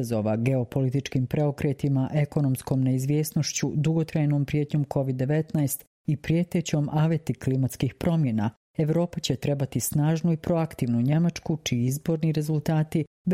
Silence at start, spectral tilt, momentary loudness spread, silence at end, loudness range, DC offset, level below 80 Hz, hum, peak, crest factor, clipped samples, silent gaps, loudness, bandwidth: 0 s; -6.5 dB/octave; 3 LU; 0 s; 1 LU; under 0.1%; -54 dBFS; none; -10 dBFS; 16 dB; under 0.1%; 5.87-6.05 s, 8.57-8.74 s, 13.07-13.25 s; -26 LUFS; 16 kHz